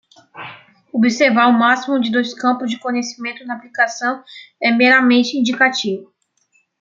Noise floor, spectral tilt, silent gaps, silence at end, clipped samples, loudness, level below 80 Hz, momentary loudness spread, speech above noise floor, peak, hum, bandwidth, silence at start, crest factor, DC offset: -62 dBFS; -3.5 dB/octave; none; 0.75 s; under 0.1%; -16 LUFS; -70 dBFS; 17 LU; 46 dB; -2 dBFS; none; 7.6 kHz; 0.35 s; 16 dB; under 0.1%